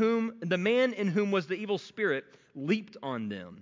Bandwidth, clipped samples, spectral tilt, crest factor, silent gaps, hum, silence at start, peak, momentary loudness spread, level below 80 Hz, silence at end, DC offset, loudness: 7.6 kHz; under 0.1%; -6.5 dB/octave; 14 dB; none; none; 0 s; -16 dBFS; 11 LU; -76 dBFS; 0 s; under 0.1%; -30 LUFS